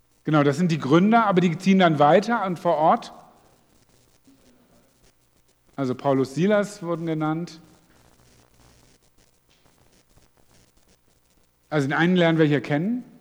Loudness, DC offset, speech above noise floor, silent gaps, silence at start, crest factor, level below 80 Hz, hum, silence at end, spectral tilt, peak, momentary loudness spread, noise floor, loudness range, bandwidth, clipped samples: -21 LUFS; under 0.1%; 42 dB; none; 0.25 s; 20 dB; -66 dBFS; none; 0.2 s; -7 dB/octave; -4 dBFS; 11 LU; -62 dBFS; 13 LU; 19 kHz; under 0.1%